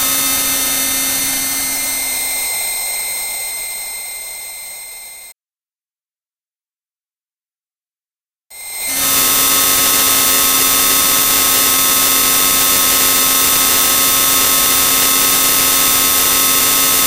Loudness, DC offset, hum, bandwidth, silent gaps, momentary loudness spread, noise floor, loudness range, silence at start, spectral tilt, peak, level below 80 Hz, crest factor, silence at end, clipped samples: -10 LUFS; under 0.1%; none; over 20 kHz; none; 13 LU; under -90 dBFS; 15 LU; 0 s; 0.5 dB/octave; 0 dBFS; -42 dBFS; 14 dB; 0 s; 0.3%